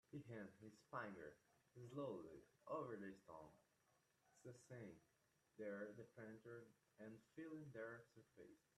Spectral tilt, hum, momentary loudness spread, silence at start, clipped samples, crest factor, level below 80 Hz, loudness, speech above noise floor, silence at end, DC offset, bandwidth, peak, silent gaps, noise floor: -7 dB/octave; none; 12 LU; 0.1 s; under 0.1%; 20 dB; -90 dBFS; -57 LUFS; 27 dB; 0.2 s; under 0.1%; 13 kHz; -38 dBFS; none; -84 dBFS